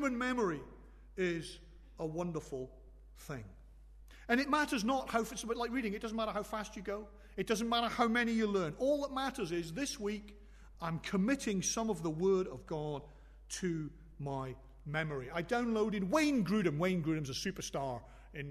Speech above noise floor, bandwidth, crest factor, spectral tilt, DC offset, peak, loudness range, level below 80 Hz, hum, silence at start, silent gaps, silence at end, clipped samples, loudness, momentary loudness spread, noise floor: 20 dB; 13.5 kHz; 18 dB; -4.5 dB/octave; under 0.1%; -18 dBFS; 5 LU; -56 dBFS; none; 0 s; none; 0 s; under 0.1%; -36 LUFS; 15 LU; -56 dBFS